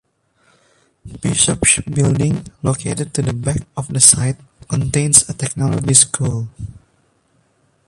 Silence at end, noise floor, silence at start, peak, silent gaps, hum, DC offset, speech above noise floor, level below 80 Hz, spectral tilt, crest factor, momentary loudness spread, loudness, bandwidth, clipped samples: 1.15 s; -60 dBFS; 1.05 s; 0 dBFS; none; none; under 0.1%; 43 dB; -40 dBFS; -3.5 dB/octave; 18 dB; 14 LU; -15 LUFS; 16 kHz; under 0.1%